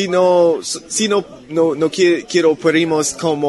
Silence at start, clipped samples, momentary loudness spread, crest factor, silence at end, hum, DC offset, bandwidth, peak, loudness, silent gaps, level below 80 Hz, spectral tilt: 0 s; under 0.1%; 7 LU; 14 dB; 0 s; none; under 0.1%; 12 kHz; -2 dBFS; -15 LUFS; none; -58 dBFS; -4 dB/octave